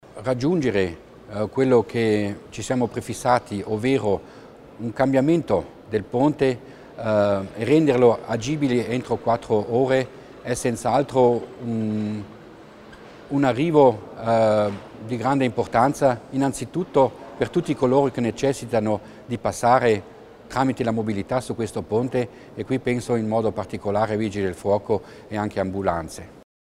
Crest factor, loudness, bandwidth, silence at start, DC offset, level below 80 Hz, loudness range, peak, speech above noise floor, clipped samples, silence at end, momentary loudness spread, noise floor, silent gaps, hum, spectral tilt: 20 dB; -22 LUFS; 14 kHz; 0.15 s; under 0.1%; -52 dBFS; 4 LU; -4 dBFS; 22 dB; under 0.1%; 0.45 s; 11 LU; -44 dBFS; none; none; -6.5 dB/octave